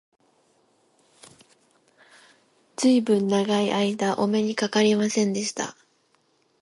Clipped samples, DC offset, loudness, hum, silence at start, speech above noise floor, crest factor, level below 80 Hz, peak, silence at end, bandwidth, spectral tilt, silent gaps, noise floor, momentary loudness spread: under 0.1%; under 0.1%; -23 LUFS; none; 2.8 s; 44 dB; 18 dB; -72 dBFS; -8 dBFS; 0.9 s; 11.5 kHz; -4.5 dB/octave; none; -66 dBFS; 8 LU